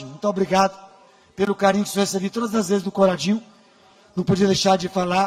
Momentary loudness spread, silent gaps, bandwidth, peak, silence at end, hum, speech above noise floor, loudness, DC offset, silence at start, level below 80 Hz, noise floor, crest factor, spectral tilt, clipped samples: 7 LU; none; 15.5 kHz; -4 dBFS; 0 s; none; 33 dB; -21 LUFS; under 0.1%; 0 s; -54 dBFS; -53 dBFS; 18 dB; -5 dB/octave; under 0.1%